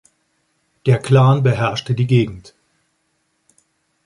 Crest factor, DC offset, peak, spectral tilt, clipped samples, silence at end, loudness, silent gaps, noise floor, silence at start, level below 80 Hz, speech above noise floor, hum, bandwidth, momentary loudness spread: 16 dB; under 0.1%; -2 dBFS; -7.5 dB/octave; under 0.1%; 1.65 s; -16 LUFS; none; -67 dBFS; 0.85 s; -50 dBFS; 52 dB; none; 11.5 kHz; 11 LU